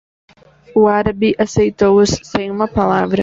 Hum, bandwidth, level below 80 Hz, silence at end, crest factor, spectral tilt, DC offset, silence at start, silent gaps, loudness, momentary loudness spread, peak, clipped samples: none; 7.8 kHz; -40 dBFS; 0 s; 14 dB; -5.5 dB/octave; under 0.1%; 0.75 s; none; -15 LUFS; 7 LU; 0 dBFS; under 0.1%